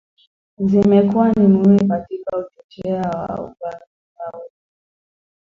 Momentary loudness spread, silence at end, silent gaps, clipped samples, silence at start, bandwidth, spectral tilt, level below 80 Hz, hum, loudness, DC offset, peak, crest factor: 19 LU; 1.15 s; 2.64-2.69 s, 3.87-4.16 s; under 0.1%; 0.6 s; 5.6 kHz; -10 dB/octave; -50 dBFS; none; -17 LUFS; under 0.1%; -2 dBFS; 16 dB